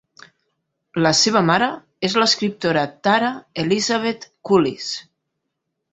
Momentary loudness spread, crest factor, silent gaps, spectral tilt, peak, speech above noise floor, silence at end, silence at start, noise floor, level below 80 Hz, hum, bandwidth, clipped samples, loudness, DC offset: 12 LU; 18 dB; none; -3.5 dB/octave; -2 dBFS; 58 dB; 0.9 s; 0.95 s; -77 dBFS; -60 dBFS; none; 8.4 kHz; under 0.1%; -19 LUFS; under 0.1%